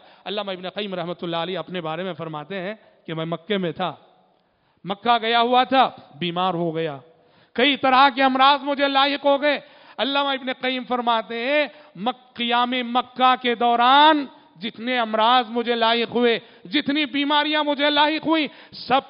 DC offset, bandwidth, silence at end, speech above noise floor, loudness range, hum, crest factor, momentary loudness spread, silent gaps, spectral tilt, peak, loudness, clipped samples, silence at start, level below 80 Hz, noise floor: under 0.1%; 5.4 kHz; 0.05 s; 43 dB; 9 LU; none; 18 dB; 14 LU; none; -1.5 dB/octave; -4 dBFS; -21 LUFS; under 0.1%; 0.25 s; -68 dBFS; -64 dBFS